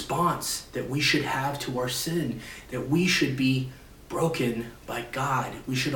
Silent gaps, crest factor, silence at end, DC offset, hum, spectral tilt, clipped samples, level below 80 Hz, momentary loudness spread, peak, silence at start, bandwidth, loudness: none; 16 dB; 0 s; under 0.1%; none; -4.5 dB/octave; under 0.1%; -52 dBFS; 12 LU; -12 dBFS; 0 s; 18 kHz; -27 LUFS